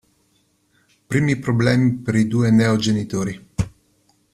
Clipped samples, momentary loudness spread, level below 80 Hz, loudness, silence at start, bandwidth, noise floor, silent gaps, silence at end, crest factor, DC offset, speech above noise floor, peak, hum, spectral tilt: under 0.1%; 11 LU; -46 dBFS; -19 LUFS; 1.1 s; 12.5 kHz; -63 dBFS; none; 0.65 s; 18 dB; under 0.1%; 45 dB; -2 dBFS; none; -6.5 dB/octave